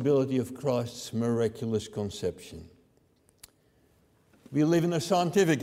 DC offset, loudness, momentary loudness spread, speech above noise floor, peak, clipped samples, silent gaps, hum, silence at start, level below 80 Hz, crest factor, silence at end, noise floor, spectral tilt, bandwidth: under 0.1%; -29 LUFS; 11 LU; 38 dB; -12 dBFS; under 0.1%; none; none; 0 s; -62 dBFS; 18 dB; 0 s; -66 dBFS; -6 dB/octave; 16 kHz